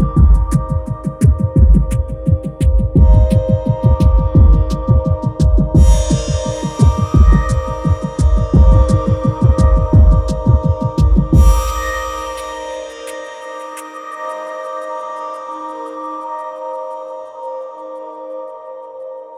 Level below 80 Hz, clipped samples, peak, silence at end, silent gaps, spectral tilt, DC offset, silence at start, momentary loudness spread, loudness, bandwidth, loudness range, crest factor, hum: -16 dBFS; under 0.1%; 0 dBFS; 0 s; none; -7.5 dB/octave; under 0.1%; 0 s; 17 LU; -14 LUFS; 14 kHz; 13 LU; 12 dB; none